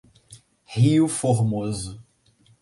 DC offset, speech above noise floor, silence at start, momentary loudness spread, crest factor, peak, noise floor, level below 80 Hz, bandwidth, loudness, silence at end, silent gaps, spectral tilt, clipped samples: under 0.1%; 39 dB; 0.3 s; 14 LU; 16 dB; -8 dBFS; -59 dBFS; -52 dBFS; 11.5 kHz; -22 LUFS; 0.6 s; none; -6.5 dB/octave; under 0.1%